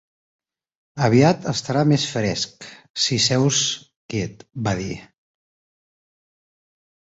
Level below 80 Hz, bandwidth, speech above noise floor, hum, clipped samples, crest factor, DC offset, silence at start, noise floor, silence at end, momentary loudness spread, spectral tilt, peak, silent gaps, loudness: -52 dBFS; 8.2 kHz; over 70 dB; none; under 0.1%; 22 dB; under 0.1%; 0.95 s; under -90 dBFS; 2.15 s; 15 LU; -4.5 dB/octave; -2 dBFS; 2.90-2.94 s, 3.96-4.09 s; -20 LUFS